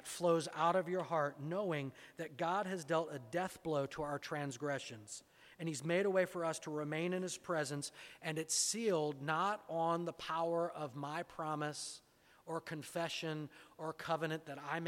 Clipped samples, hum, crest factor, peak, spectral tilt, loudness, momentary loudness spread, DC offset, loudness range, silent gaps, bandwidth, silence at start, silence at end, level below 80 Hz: under 0.1%; none; 18 dB; -20 dBFS; -4 dB/octave; -39 LUFS; 12 LU; under 0.1%; 5 LU; none; 16.5 kHz; 0 s; 0 s; -78 dBFS